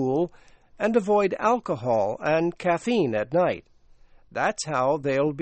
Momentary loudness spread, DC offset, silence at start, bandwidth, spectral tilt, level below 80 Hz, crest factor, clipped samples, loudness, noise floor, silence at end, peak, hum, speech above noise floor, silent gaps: 5 LU; under 0.1%; 0 s; 8.4 kHz; -6 dB/octave; -58 dBFS; 16 dB; under 0.1%; -24 LUFS; -53 dBFS; 0 s; -8 dBFS; none; 29 dB; none